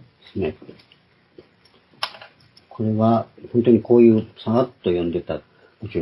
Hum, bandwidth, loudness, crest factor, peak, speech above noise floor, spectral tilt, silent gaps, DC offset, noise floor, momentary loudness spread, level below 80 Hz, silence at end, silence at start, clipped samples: none; 11.5 kHz; -20 LUFS; 18 dB; -2 dBFS; 37 dB; -9 dB/octave; none; under 0.1%; -56 dBFS; 17 LU; -60 dBFS; 0 s; 0.35 s; under 0.1%